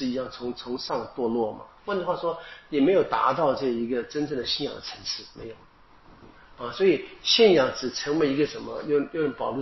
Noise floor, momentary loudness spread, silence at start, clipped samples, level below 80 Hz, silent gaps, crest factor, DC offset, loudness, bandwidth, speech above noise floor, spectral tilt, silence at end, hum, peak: -53 dBFS; 13 LU; 0 s; under 0.1%; -58 dBFS; none; 20 dB; under 0.1%; -25 LUFS; 6.2 kHz; 27 dB; -3 dB/octave; 0 s; none; -6 dBFS